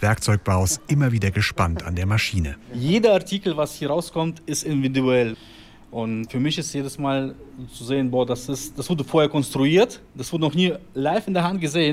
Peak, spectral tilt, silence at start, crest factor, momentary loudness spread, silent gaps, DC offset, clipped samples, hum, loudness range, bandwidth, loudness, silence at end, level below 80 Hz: -6 dBFS; -5.5 dB/octave; 0 s; 16 dB; 10 LU; none; under 0.1%; under 0.1%; none; 4 LU; 16 kHz; -22 LUFS; 0 s; -46 dBFS